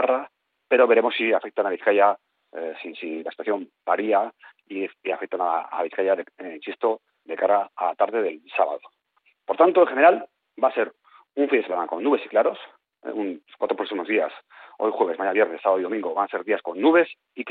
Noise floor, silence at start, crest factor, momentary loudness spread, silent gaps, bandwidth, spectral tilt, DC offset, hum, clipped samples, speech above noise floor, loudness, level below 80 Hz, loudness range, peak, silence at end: -66 dBFS; 0 s; 20 dB; 16 LU; none; 4.5 kHz; -1.5 dB/octave; under 0.1%; none; under 0.1%; 44 dB; -23 LUFS; -80 dBFS; 5 LU; -4 dBFS; 0 s